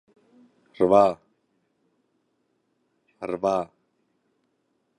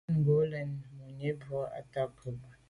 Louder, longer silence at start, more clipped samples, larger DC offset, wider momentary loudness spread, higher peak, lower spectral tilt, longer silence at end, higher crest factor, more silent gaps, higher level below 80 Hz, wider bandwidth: first, -23 LUFS vs -34 LUFS; first, 0.8 s vs 0.1 s; neither; neither; first, 21 LU vs 16 LU; first, -4 dBFS vs -18 dBFS; second, -7 dB/octave vs -9.5 dB/octave; first, 1.35 s vs 0.15 s; first, 24 dB vs 16 dB; neither; about the same, -64 dBFS vs -64 dBFS; about the same, 10 kHz vs 10.5 kHz